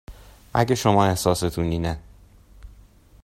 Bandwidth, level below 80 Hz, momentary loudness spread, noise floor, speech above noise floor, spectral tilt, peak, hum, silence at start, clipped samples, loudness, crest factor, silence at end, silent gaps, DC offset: 16 kHz; -44 dBFS; 9 LU; -51 dBFS; 30 dB; -5.5 dB/octave; -2 dBFS; none; 0.1 s; under 0.1%; -22 LUFS; 22 dB; 0.55 s; none; under 0.1%